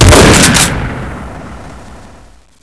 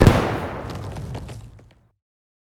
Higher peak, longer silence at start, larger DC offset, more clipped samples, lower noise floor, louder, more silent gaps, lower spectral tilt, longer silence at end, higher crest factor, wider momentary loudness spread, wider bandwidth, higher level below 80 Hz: about the same, 0 dBFS vs 0 dBFS; about the same, 0 s vs 0 s; first, 1% vs under 0.1%; first, 3% vs under 0.1%; second, -40 dBFS vs -50 dBFS; first, -6 LUFS vs -25 LUFS; neither; second, -3.5 dB/octave vs -7 dB/octave; second, 0.65 s vs 1 s; second, 10 dB vs 22 dB; first, 25 LU vs 20 LU; second, 11 kHz vs 17.5 kHz; first, -20 dBFS vs -32 dBFS